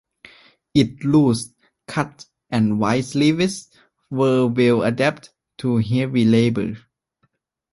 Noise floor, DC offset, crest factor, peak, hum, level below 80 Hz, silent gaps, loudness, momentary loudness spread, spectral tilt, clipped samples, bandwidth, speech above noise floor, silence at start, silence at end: -68 dBFS; under 0.1%; 16 dB; -4 dBFS; none; -54 dBFS; none; -20 LUFS; 12 LU; -6.5 dB/octave; under 0.1%; 11.5 kHz; 50 dB; 0.75 s; 0.95 s